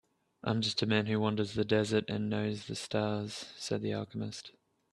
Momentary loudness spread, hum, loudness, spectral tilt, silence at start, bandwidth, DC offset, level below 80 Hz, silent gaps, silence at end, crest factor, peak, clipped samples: 11 LU; none; -33 LUFS; -5.5 dB/octave; 0.45 s; 12 kHz; under 0.1%; -68 dBFS; none; 0.4 s; 22 dB; -12 dBFS; under 0.1%